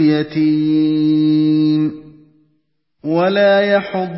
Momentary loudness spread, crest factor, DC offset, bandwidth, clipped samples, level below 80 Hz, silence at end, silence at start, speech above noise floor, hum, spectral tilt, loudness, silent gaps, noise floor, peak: 6 LU; 12 dB; under 0.1%; 5.8 kHz; under 0.1%; -58 dBFS; 0 s; 0 s; 52 dB; none; -11.5 dB/octave; -15 LUFS; none; -66 dBFS; -2 dBFS